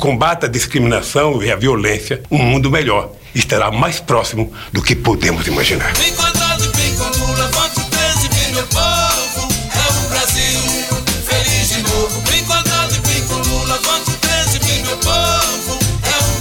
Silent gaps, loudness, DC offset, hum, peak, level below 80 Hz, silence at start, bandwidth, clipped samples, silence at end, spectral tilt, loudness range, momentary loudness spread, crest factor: none; -14 LUFS; 0.5%; none; 0 dBFS; -28 dBFS; 0 s; over 20 kHz; under 0.1%; 0 s; -3 dB/octave; 1 LU; 4 LU; 14 dB